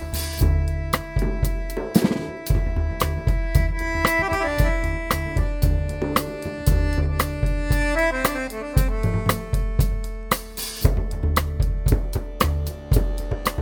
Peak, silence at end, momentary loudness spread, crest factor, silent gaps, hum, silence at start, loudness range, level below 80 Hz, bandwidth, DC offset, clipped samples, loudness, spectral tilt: -2 dBFS; 0 s; 5 LU; 18 dB; none; none; 0 s; 1 LU; -24 dBFS; over 20 kHz; under 0.1%; under 0.1%; -23 LUFS; -5.5 dB/octave